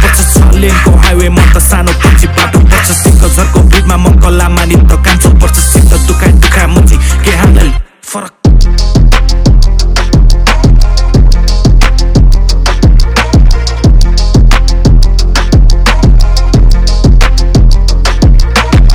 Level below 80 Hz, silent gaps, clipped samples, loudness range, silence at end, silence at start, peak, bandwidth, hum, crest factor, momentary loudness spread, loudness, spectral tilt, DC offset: -6 dBFS; none; 20%; 2 LU; 0 s; 0 s; 0 dBFS; 15.5 kHz; none; 4 dB; 3 LU; -7 LUFS; -5 dB/octave; under 0.1%